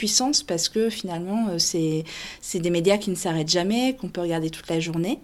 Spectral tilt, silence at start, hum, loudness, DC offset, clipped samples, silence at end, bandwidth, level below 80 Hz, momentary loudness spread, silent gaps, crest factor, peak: -3.5 dB/octave; 0 s; none; -24 LUFS; under 0.1%; under 0.1%; 0.05 s; 16 kHz; -54 dBFS; 8 LU; none; 18 dB; -6 dBFS